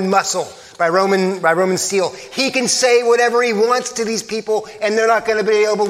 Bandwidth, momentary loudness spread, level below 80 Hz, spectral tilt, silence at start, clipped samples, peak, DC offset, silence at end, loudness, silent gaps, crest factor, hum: 15.5 kHz; 8 LU; -62 dBFS; -3 dB/octave; 0 s; under 0.1%; 0 dBFS; under 0.1%; 0 s; -16 LUFS; none; 16 dB; none